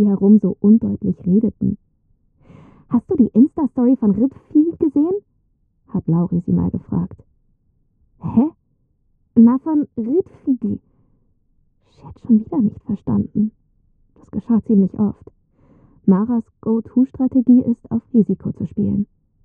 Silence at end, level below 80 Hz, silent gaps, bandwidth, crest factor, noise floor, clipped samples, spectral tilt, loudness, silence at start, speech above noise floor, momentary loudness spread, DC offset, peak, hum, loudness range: 0.4 s; -50 dBFS; none; 1.9 kHz; 16 dB; -63 dBFS; under 0.1%; -13.5 dB/octave; -18 LUFS; 0 s; 46 dB; 11 LU; under 0.1%; -2 dBFS; none; 5 LU